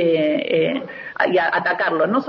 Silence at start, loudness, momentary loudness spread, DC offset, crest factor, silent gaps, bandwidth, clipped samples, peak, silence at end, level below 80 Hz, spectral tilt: 0 s; -19 LUFS; 6 LU; under 0.1%; 14 dB; none; 6 kHz; under 0.1%; -4 dBFS; 0 s; -66 dBFS; -7.5 dB/octave